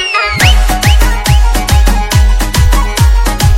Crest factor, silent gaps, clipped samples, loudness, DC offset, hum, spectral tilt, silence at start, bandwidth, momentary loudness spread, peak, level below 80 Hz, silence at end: 8 dB; none; 1%; -10 LUFS; under 0.1%; none; -4 dB/octave; 0 s; 16.5 kHz; 3 LU; 0 dBFS; -10 dBFS; 0 s